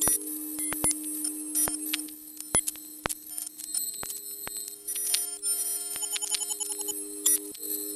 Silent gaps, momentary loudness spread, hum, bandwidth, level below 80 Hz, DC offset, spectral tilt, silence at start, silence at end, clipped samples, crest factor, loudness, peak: none; 9 LU; none; 14 kHz; -58 dBFS; under 0.1%; -0.5 dB/octave; 0 s; 0 s; under 0.1%; 28 dB; -29 LUFS; -4 dBFS